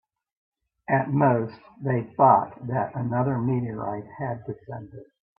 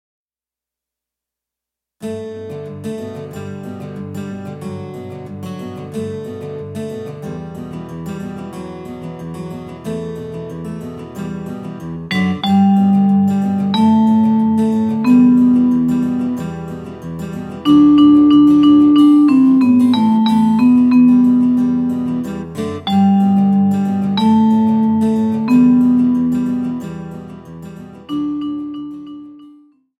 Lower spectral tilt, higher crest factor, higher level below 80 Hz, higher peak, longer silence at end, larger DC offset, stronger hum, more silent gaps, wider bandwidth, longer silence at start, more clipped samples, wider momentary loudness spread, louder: first, -13 dB/octave vs -8 dB/octave; first, 22 dB vs 14 dB; second, -64 dBFS vs -50 dBFS; about the same, -4 dBFS vs -2 dBFS; second, 0.35 s vs 0.5 s; neither; neither; neither; second, 5.2 kHz vs 10.5 kHz; second, 0.9 s vs 2 s; neither; about the same, 18 LU vs 19 LU; second, -25 LUFS vs -13 LUFS